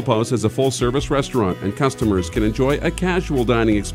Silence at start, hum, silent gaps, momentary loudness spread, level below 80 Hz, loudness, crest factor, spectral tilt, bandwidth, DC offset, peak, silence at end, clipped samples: 0 s; none; none; 3 LU; -32 dBFS; -19 LUFS; 16 dB; -6 dB/octave; 16 kHz; under 0.1%; -2 dBFS; 0 s; under 0.1%